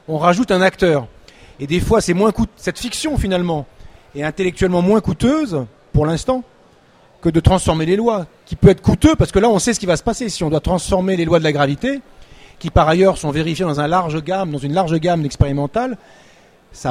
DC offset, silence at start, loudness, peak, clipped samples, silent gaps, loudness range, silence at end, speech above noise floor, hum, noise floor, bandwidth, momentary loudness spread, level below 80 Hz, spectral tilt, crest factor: under 0.1%; 0.1 s; -17 LUFS; 0 dBFS; under 0.1%; none; 4 LU; 0 s; 34 dB; none; -50 dBFS; 15.5 kHz; 10 LU; -32 dBFS; -6 dB/octave; 16 dB